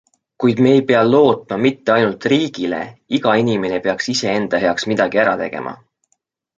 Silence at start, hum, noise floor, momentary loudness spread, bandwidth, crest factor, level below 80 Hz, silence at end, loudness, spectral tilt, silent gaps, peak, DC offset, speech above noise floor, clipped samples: 0.4 s; none; -68 dBFS; 10 LU; 7.8 kHz; 16 dB; -56 dBFS; 0.85 s; -16 LUFS; -5.5 dB/octave; none; 0 dBFS; under 0.1%; 52 dB; under 0.1%